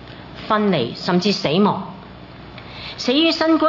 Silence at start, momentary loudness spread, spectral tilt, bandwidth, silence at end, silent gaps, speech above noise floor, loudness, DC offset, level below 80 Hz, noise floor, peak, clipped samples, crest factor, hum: 0 s; 22 LU; -5.5 dB/octave; 6 kHz; 0 s; none; 21 dB; -18 LUFS; under 0.1%; -50 dBFS; -38 dBFS; -4 dBFS; under 0.1%; 16 dB; none